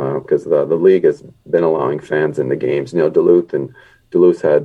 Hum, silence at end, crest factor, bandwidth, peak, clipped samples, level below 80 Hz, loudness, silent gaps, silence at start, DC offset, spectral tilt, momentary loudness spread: none; 0 s; 14 dB; 8.2 kHz; 0 dBFS; under 0.1%; -58 dBFS; -15 LUFS; none; 0 s; under 0.1%; -8.5 dB/octave; 9 LU